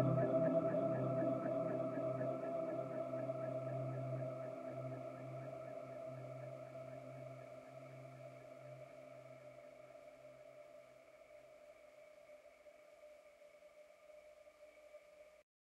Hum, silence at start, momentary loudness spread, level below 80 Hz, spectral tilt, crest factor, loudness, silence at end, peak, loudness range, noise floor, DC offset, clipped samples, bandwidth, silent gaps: none; 0 s; 24 LU; -82 dBFS; -9 dB/octave; 22 dB; -43 LUFS; 0.4 s; -24 dBFS; 21 LU; -63 dBFS; under 0.1%; under 0.1%; 11.5 kHz; none